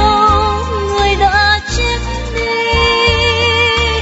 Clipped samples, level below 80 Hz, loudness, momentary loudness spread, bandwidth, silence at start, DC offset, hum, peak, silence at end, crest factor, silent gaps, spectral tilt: under 0.1%; -22 dBFS; -12 LUFS; 7 LU; 8 kHz; 0 s; under 0.1%; none; 0 dBFS; 0 s; 12 dB; none; -4 dB/octave